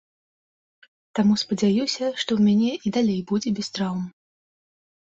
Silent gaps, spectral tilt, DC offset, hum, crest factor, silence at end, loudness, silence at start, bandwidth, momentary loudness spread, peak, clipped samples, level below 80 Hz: none; -5.5 dB/octave; under 0.1%; none; 14 dB; 0.95 s; -23 LUFS; 1.15 s; 7.8 kHz; 8 LU; -10 dBFS; under 0.1%; -62 dBFS